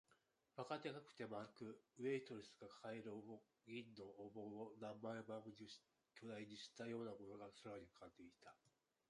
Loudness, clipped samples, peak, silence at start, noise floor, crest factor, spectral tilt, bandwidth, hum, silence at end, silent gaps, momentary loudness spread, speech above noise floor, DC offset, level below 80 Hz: -55 LUFS; under 0.1%; -34 dBFS; 0.1 s; -82 dBFS; 20 dB; -5.5 dB/octave; 11 kHz; none; 0.4 s; none; 13 LU; 28 dB; under 0.1%; -88 dBFS